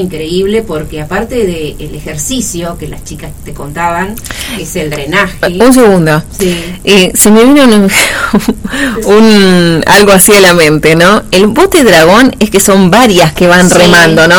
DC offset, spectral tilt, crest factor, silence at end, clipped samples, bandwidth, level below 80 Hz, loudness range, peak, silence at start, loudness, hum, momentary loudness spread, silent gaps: under 0.1%; -4 dB/octave; 6 dB; 0 s; 6%; over 20 kHz; -28 dBFS; 12 LU; 0 dBFS; 0 s; -6 LUFS; none; 15 LU; none